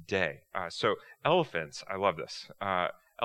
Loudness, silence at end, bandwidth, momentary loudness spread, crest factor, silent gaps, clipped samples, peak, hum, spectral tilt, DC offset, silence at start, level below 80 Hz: -32 LUFS; 0 s; 13.5 kHz; 10 LU; 22 dB; none; under 0.1%; -10 dBFS; none; -4.5 dB/octave; under 0.1%; 0 s; -72 dBFS